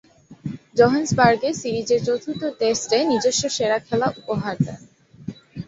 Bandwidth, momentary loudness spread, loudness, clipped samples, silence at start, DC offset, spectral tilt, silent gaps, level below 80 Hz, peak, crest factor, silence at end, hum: 8 kHz; 18 LU; -21 LUFS; under 0.1%; 0.3 s; under 0.1%; -4.5 dB/octave; none; -54 dBFS; -2 dBFS; 20 dB; 0.05 s; none